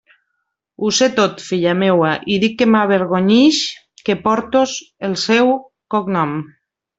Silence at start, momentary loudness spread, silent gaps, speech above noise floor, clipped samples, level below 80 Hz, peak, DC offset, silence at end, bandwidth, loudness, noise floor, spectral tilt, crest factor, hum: 0.8 s; 10 LU; none; 58 dB; under 0.1%; -58 dBFS; -2 dBFS; under 0.1%; 0.5 s; 8 kHz; -16 LUFS; -73 dBFS; -4.5 dB/octave; 14 dB; none